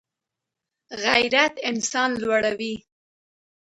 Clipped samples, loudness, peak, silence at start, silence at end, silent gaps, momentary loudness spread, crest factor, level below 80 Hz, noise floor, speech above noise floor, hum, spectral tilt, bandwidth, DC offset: under 0.1%; -22 LUFS; -4 dBFS; 0.9 s; 0.9 s; none; 13 LU; 22 dB; -64 dBFS; -85 dBFS; 63 dB; none; -2 dB/octave; 11.5 kHz; under 0.1%